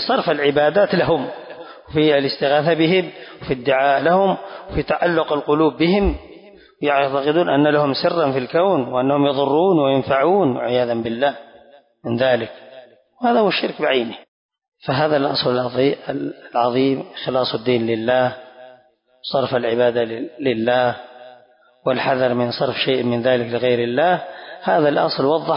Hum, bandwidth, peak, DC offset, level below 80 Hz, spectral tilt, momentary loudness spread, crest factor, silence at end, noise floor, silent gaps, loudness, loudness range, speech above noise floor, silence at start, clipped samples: none; 5.4 kHz; -4 dBFS; under 0.1%; -44 dBFS; -10.5 dB/octave; 11 LU; 14 dB; 0 s; -54 dBFS; 14.28-14.49 s, 14.68-14.72 s; -18 LUFS; 4 LU; 36 dB; 0 s; under 0.1%